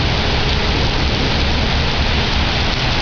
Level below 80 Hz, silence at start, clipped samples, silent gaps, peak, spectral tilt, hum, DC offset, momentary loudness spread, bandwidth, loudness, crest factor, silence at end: -20 dBFS; 0 s; under 0.1%; none; -4 dBFS; -5 dB/octave; none; under 0.1%; 0 LU; 5.4 kHz; -16 LUFS; 10 dB; 0 s